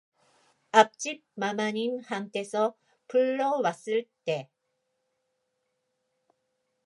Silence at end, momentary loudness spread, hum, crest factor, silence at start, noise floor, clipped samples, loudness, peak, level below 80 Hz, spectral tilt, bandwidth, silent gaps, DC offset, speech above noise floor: 2.4 s; 12 LU; none; 28 dB; 0.75 s; -79 dBFS; under 0.1%; -28 LUFS; -2 dBFS; -88 dBFS; -4 dB/octave; 11.5 kHz; none; under 0.1%; 51 dB